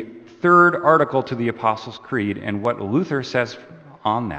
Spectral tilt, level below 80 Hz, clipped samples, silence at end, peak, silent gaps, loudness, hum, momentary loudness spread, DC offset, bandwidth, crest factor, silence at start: -7 dB/octave; -58 dBFS; under 0.1%; 0 s; 0 dBFS; none; -20 LUFS; none; 14 LU; under 0.1%; 8.2 kHz; 20 dB; 0 s